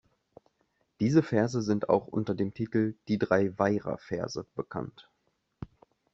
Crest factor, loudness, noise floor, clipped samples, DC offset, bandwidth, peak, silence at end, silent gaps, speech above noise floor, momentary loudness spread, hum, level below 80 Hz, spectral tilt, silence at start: 22 dB; -29 LUFS; -76 dBFS; under 0.1%; under 0.1%; 7.8 kHz; -8 dBFS; 0.5 s; none; 48 dB; 15 LU; none; -64 dBFS; -7 dB/octave; 1 s